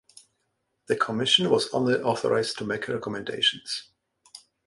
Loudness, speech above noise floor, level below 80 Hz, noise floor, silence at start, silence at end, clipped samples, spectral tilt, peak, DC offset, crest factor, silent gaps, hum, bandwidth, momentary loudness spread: -25 LUFS; 51 dB; -66 dBFS; -76 dBFS; 0.9 s; 0.3 s; under 0.1%; -3.5 dB/octave; -6 dBFS; under 0.1%; 22 dB; none; none; 11.5 kHz; 12 LU